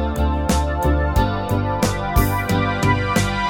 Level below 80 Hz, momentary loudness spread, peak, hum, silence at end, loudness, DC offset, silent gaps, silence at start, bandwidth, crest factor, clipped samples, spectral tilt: -24 dBFS; 2 LU; -2 dBFS; none; 0 s; -19 LUFS; under 0.1%; none; 0 s; 18.5 kHz; 16 dB; under 0.1%; -5.5 dB/octave